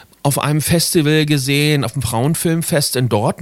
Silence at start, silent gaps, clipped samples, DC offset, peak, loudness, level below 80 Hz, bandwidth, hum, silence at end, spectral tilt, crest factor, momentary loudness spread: 0.25 s; none; under 0.1%; under 0.1%; 0 dBFS; -16 LUFS; -44 dBFS; 16.5 kHz; none; 0 s; -4.5 dB/octave; 14 dB; 4 LU